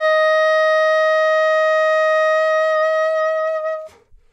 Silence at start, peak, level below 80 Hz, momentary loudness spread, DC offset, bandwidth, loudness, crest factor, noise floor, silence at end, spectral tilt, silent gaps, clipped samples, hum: 0 s; -6 dBFS; -62 dBFS; 6 LU; under 0.1%; 8.6 kHz; -16 LUFS; 10 dB; -41 dBFS; 0.45 s; 1.5 dB/octave; none; under 0.1%; none